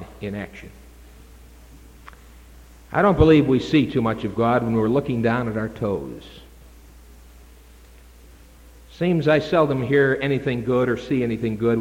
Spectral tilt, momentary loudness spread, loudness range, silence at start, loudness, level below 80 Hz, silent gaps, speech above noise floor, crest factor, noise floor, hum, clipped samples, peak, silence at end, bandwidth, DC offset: -8 dB/octave; 15 LU; 11 LU; 0 s; -21 LUFS; -42 dBFS; none; 27 dB; 18 dB; -47 dBFS; none; under 0.1%; -4 dBFS; 0 s; 16.5 kHz; under 0.1%